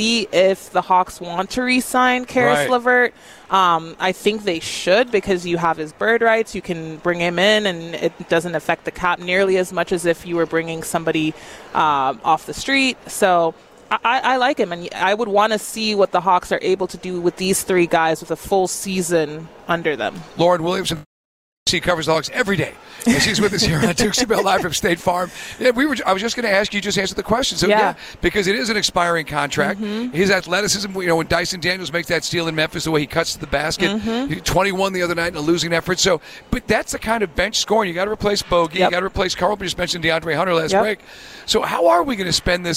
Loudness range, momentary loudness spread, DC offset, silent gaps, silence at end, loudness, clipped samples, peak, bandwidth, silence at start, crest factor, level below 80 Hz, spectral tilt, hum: 2 LU; 7 LU; under 0.1%; 21.06-21.66 s; 0 s; -19 LUFS; under 0.1%; -4 dBFS; 16 kHz; 0 s; 14 dB; -42 dBFS; -3.5 dB/octave; none